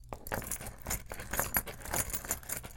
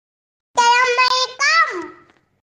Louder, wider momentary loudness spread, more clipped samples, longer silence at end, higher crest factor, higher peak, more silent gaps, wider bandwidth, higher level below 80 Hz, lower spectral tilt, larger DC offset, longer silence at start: second, -36 LUFS vs -15 LUFS; second, 7 LU vs 13 LU; neither; second, 0 s vs 0.6 s; first, 28 dB vs 14 dB; second, -10 dBFS vs -4 dBFS; neither; first, 17 kHz vs 10 kHz; first, -48 dBFS vs -70 dBFS; first, -2.5 dB/octave vs 1 dB/octave; neither; second, 0 s vs 0.55 s